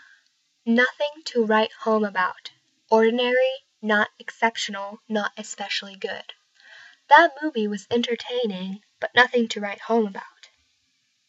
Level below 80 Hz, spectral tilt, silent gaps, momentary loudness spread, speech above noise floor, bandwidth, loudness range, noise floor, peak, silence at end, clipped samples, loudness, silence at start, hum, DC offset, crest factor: -80 dBFS; -4 dB/octave; none; 15 LU; 47 dB; 8.2 kHz; 4 LU; -69 dBFS; -2 dBFS; 1 s; under 0.1%; -23 LUFS; 0.65 s; none; under 0.1%; 22 dB